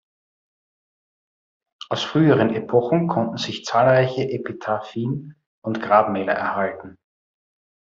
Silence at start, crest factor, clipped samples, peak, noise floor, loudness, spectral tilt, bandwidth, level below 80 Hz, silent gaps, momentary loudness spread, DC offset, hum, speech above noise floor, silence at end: 1.9 s; 20 dB; under 0.1%; -2 dBFS; under -90 dBFS; -21 LUFS; -6.5 dB/octave; 7.6 kHz; -62 dBFS; 5.46-5.62 s; 12 LU; under 0.1%; none; over 70 dB; 0.9 s